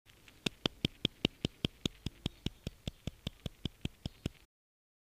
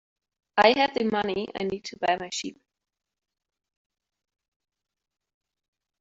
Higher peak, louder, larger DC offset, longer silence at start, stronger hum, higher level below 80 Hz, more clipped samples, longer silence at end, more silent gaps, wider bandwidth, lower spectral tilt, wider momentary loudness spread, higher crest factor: second, -8 dBFS vs -4 dBFS; second, -40 LUFS vs -25 LUFS; neither; about the same, 0.45 s vs 0.55 s; neither; first, -52 dBFS vs -66 dBFS; neither; second, 0.9 s vs 3.5 s; neither; first, 15.5 kHz vs 8 kHz; about the same, -4.5 dB/octave vs -3.5 dB/octave; second, 10 LU vs 13 LU; first, 32 dB vs 26 dB